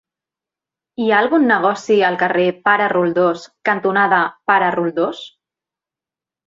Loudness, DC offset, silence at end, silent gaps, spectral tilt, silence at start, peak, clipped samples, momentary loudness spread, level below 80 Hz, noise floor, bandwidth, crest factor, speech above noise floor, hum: -16 LUFS; under 0.1%; 1.2 s; none; -6 dB/octave; 1 s; -2 dBFS; under 0.1%; 8 LU; -66 dBFS; -89 dBFS; 7.8 kHz; 16 dB; 73 dB; none